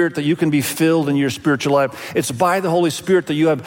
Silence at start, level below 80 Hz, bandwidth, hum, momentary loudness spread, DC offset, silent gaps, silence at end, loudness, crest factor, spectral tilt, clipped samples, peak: 0 s; -60 dBFS; 17 kHz; none; 3 LU; under 0.1%; none; 0 s; -18 LUFS; 14 dB; -5.5 dB/octave; under 0.1%; -4 dBFS